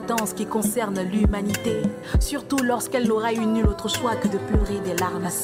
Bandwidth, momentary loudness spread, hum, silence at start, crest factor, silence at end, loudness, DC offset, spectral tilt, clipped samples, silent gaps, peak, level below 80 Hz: 16 kHz; 3 LU; none; 0 s; 14 dB; 0 s; -24 LUFS; under 0.1%; -5 dB/octave; under 0.1%; none; -8 dBFS; -30 dBFS